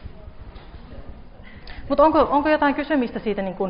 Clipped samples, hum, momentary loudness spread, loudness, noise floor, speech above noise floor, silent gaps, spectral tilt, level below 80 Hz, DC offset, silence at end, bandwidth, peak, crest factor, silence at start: under 0.1%; none; 26 LU; -20 LUFS; -40 dBFS; 21 dB; none; -4 dB/octave; -42 dBFS; under 0.1%; 0 s; 5.4 kHz; -6 dBFS; 18 dB; 0 s